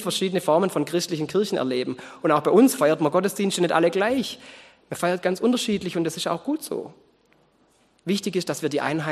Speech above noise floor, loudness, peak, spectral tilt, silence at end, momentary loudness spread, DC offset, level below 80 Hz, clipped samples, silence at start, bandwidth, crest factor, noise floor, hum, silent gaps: 39 dB; -23 LUFS; -4 dBFS; -4.5 dB/octave; 0 s; 11 LU; under 0.1%; -66 dBFS; under 0.1%; 0 s; 13 kHz; 20 dB; -62 dBFS; none; none